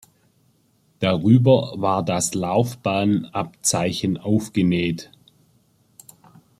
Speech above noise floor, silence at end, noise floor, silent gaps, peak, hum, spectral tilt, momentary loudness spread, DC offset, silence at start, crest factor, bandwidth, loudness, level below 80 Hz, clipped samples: 42 dB; 1.55 s; -62 dBFS; none; -2 dBFS; none; -5.5 dB/octave; 8 LU; under 0.1%; 1 s; 20 dB; 15 kHz; -21 LUFS; -58 dBFS; under 0.1%